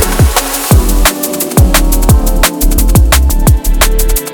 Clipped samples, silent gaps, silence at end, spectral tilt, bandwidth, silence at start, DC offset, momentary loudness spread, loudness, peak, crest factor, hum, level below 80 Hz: 0.3%; none; 0 s; -4 dB/octave; over 20 kHz; 0 s; under 0.1%; 4 LU; -10 LUFS; 0 dBFS; 8 dB; none; -10 dBFS